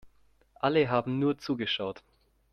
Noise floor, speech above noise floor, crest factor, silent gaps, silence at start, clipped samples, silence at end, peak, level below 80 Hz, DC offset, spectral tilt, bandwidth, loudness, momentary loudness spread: -63 dBFS; 34 dB; 20 dB; none; 0.05 s; under 0.1%; 0.55 s; -12 dBFS; -66 dBFS; under 0.1%; -7 dB/octave; 6.6 kHz; -29 LUFS; 9 LU